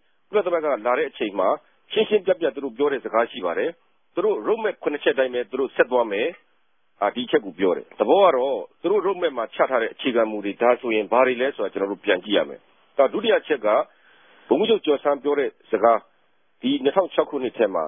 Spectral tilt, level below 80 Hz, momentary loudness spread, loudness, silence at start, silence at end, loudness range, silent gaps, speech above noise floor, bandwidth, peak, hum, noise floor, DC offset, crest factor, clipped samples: -9 dB/octave; -72 dBFS; 7 LU; -22 LUFS; 0.3 s; 0 s; 2 LU; none; 48 dB; 3.8 kHz; -4 dBFS; none; -69 dBFS; under 0.1%; 18 dB; under 0.1%